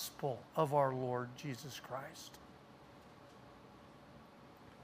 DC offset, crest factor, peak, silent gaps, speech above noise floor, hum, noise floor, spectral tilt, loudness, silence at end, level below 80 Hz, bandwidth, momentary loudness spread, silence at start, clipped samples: under 0.1%; 22 dB; -20 dBFS; none; 20 dB; none; -59 dBFS; -5.5 dB/octave; -39 LUFS; 0 s; -74 dBFS; 15.5 kHz; 24 LU; 0 s; under 0.1%